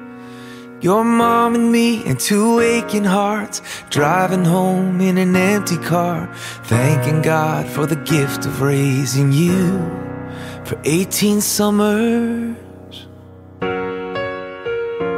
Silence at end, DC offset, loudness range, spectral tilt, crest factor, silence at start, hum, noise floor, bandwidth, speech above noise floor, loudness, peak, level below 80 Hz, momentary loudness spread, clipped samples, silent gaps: 0 s; under 0.1%; 3 LU; -5.5 dB/octave; 16 dB; 0 s; none; -39 dBFS; 16 kHz; 23 dB; -17 LUFS; 0 dBFS; -50 dBFS; 14 LU; under 0.1%; none